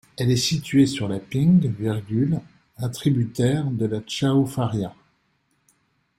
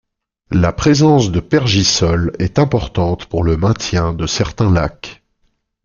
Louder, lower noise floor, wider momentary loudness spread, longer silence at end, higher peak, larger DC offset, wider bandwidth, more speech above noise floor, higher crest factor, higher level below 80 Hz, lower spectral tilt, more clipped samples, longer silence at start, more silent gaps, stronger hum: second, -22 LUFS vs -15 LUFS; first, -68 dBFS vs -63 dBFS; about the same, 9 LU vs 7 LU; first, 1.3 s vs 0.7 s; second, -6 dBFS vs -2 dBFS; neither; first, 16 kHz vs 7.4 kHz; about the same, 47 dB vs 49 dB; about the same, 16 dB vs 14 dB; second, -54 dBFS vs -32 dBFS; about the same, -6 dB/octave vs -5.5 dB/octave; neither; second, 0.2 s vs 0.5 s; neither; neither